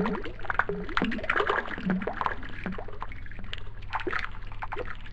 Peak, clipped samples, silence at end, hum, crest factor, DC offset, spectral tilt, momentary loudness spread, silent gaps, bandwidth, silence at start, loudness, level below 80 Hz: -8 dBFS; under 0.1%; 0 s; none; 22 dB; 1%; -6.5 dB/octave; 13 LU; none; 8 kHz; 0 s; -32 LUFS; -40 dBFS